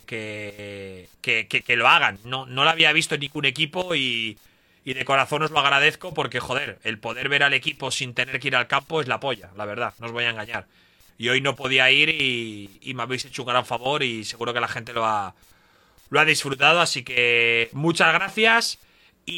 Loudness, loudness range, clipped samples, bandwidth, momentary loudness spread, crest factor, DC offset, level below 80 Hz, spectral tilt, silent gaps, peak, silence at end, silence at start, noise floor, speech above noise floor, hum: -21 LUFS; 6 LU; under 0.1%; 17.5 kHz; 15 LU; 20 dB; under 0.1%; -62 dBFS; -3 dB/octave; none; -2 dBFS; 0 s; 0.1 s; -57 dBFS; 34 dB; none